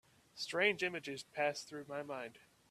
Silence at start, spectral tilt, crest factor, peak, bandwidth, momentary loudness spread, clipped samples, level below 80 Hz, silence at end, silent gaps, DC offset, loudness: 0.35 s; -3 dB/octave; 24 dB; -18 dBFS; 14.5 kHz; 13 LU; under 0.1%; -82 dBFS; 0.3 s; none; under 0.1%; -39 LUFS